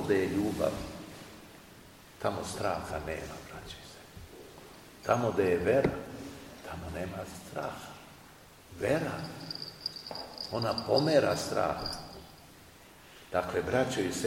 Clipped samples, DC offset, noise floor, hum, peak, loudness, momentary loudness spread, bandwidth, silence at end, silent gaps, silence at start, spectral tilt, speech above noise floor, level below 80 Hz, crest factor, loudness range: under 0.1%; under 0.1%; -54 dBFS; none; -12 dBFS; -32 LUFS; 24 LU; 16.5 kHz; 0 s; none; 0 s; -5 dB/octave; 23 dB; -56 dBFS; 22 dB; 7 LU